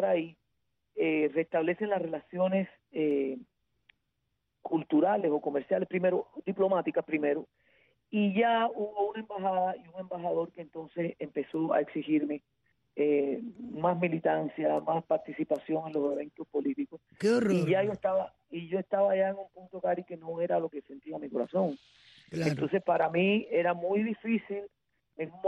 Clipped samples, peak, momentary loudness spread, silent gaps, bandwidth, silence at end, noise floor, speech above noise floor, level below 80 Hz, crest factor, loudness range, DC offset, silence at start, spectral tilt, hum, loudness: under 0.1%; -16 dBFS; 13 LU; none; 9.6 kHz; 0 s; -81 dBFS; 51 dB; -74 dBFS; 16 dB; 3 LU; under 0.1%; 0 s; -7.5 dB/octave; none; -31 LUFS